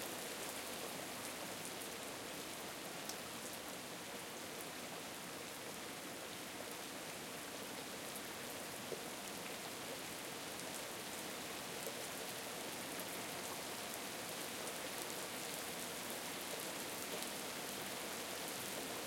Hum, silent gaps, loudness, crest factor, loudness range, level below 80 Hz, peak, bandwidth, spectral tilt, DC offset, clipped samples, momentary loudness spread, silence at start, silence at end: none; none; -45 LUFS; 24 dB; 3 LU; -78 dBFS; -22 dBFS; 17 kHz; -2 dB/octave; under 0.1%; under 0.1%; 3 LU; 0 s; 0 s